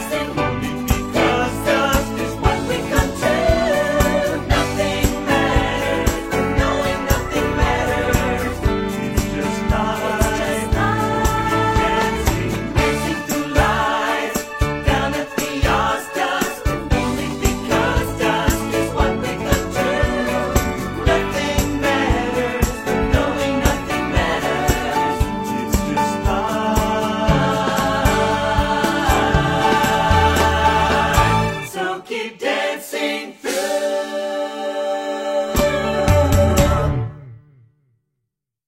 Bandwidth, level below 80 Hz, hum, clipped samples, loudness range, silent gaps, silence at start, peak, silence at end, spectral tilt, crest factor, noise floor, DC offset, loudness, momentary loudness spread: 16.5 kHz; -26 dBFS; none; under 0.1%; 3 LU; none; 0 s; 0 dBFS; 1.3 s; -5 dB/octave; 18 dB; -78 dBFS; under 0.1%; -19 LUFS; 6 LU